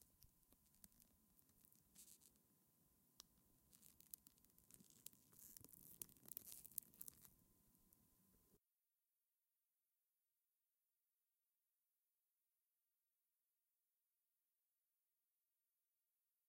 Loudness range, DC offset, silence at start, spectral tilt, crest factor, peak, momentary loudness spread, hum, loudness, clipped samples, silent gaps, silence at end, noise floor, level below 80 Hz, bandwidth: 9 LU; under 0.1%; 0 s; -1.5 dB/octave; 46 dB; -22 dBFS; 15 LU; none; -60 LUFS; under 0.1%; none; 7.9 s; under -90 dBFS; -90 dBFS; 16.5 kHz